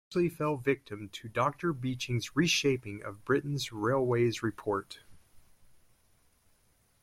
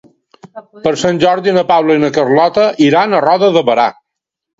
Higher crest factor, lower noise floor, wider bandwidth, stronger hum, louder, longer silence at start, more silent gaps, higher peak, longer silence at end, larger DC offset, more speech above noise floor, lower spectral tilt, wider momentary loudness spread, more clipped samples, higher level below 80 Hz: first, 18 dB vs 12 dB; second, -69 dBFS vs -78 dBFS; first, 16 kHz vs 7.8 kHz; neither; second, -31 LUFS vs -11 LUFS; second, 0.1 s vs 0.45 s; neither; second, -14 dBFS vs 0 dBFS; first, 1.65 s vs 0.65 s; neither; second, 37 dB vs 67 dB; about the same, -5 dB/octave vs -5.5 dB/octave; first, 14 LU vs 4 LU; neither; second, -64 dBFS vs -54 dBFS